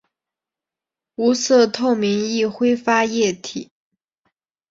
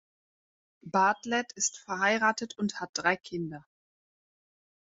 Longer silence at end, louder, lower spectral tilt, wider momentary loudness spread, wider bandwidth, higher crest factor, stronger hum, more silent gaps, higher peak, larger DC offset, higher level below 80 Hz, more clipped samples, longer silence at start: second, 1.1 s vs 1.25 s; first, -18 LUFS vs -29 LUFS; about the same, -4 dB/octave vs -3 dB/octave; about the same, 14 LU vs 12 LU; about the same, 7.8 kHz vs 8 kHz; about the same, 18 dB vs 20 dB; neither; second, none vs 2.89-2.93 s; first, -2 dBFS vs -12 dBFS; neither; first, -64 dBFS vs -74 dBFS; neither; first, 1.2 s vs 0.85 s